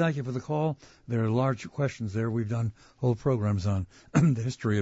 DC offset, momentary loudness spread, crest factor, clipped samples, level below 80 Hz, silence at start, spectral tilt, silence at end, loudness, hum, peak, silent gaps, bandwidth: under 0.1%; 7 LU; 18 dB; under 0.1%; -56 dBFS; 0 s; -7.5 dB/octave; 0 s; -29 LUFS; none; -10 dBFS; none; 8 kHz